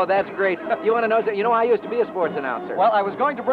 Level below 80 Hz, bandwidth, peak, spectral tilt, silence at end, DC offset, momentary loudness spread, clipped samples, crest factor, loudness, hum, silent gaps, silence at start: -66 dBFS; 4.9 kHz; -8 dBFS; -7.5 dB/octave; 0 s; under 0.1%; 5 LU; under 0.1%; 12 dB; -21 LUFS; none; none; 0 s